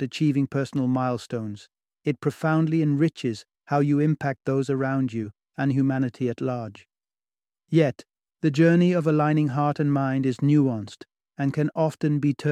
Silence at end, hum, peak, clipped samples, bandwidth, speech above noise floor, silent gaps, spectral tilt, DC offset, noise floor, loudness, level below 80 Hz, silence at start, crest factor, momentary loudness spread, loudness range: 0 s; none; -6 dBFS; under 0.1%; 10 kHz; over 67 dB; none; -8 dB/octave; under 0.1%; under -90 dBFS; -24 LUFS; -66 dBFS; 0 s; 16 dB; 11 LU; 5 LU